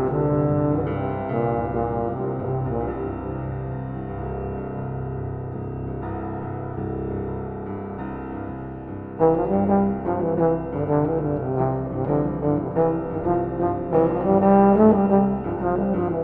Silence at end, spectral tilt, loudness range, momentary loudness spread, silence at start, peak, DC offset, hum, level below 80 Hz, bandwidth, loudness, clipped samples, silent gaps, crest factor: 0 s; -13 dB/octave; 11 LU; 12 LU; 0 s; -4 dBFS; under 0.1%; none; -42 dBFS; 3.8 kHz; -23 LUFS; under 0.1%; none; 20 dB